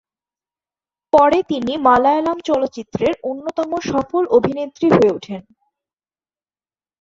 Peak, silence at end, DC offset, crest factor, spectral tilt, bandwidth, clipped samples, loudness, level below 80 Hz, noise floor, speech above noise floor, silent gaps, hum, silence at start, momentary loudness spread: -2 dBFS; 1.6 s; under 0.1%; 18 dB; -6.5 dB/octave; 7.6 kHz; under 0.1%; -17 LUFS; -52 dBFS; under -90 dBFS; over 73 dB; none; none; 1.15 s; 11 LU